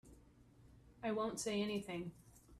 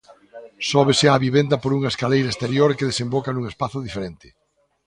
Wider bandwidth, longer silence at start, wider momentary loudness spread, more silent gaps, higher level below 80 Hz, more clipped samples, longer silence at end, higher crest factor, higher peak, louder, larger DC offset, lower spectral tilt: first, 14 kHz vs 11 kHz; second, 0.05 s vs 0.35 s; second, 8 LU vs 12 LU; neither; second, -68 dBFS vs -52 dBFS; neither; second, 0 s vs 0.7 s; about the same, 16 dB vs 20 dB; second, -28 dBFS vs -2 dBFS; second, -42 LUFS vs -20 LUFS; neither; about the same, -4.5 dB/octave vs -5.5 dB/octave